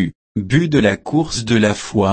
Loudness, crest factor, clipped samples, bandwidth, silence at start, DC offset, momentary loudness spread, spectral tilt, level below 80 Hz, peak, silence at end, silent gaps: -17 LUFS; 14 dB; under 0.1%; 8.8 kHz; 0 s; under 0.1%; 5 LU; -5.5 dB/octave; -42 dBFS; -2 dBFS; 0 s; 0.15-0.35 s